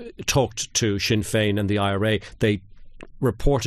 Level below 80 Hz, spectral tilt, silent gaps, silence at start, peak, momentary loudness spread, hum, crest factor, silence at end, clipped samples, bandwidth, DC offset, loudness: -36 dBFS; -4.5 dB/octave; none; 0 s; -8 dBFS; 3 LU; none; 16 dB; 0 s; under 0.1%; 13 kHz; under 0.1%; -23 LUFS